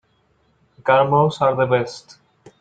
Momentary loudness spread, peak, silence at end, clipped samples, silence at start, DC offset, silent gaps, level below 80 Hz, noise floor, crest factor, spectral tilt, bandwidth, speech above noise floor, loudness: 14 LU; -2 dBFS; 0.6 s; under 0.1%; 0.85 s; under 0.1%; none; -60 dBFS; -62 dBFS; 18 dB; -6.5 dB/octave; 9 kHz; 45 dB; -18 LUFS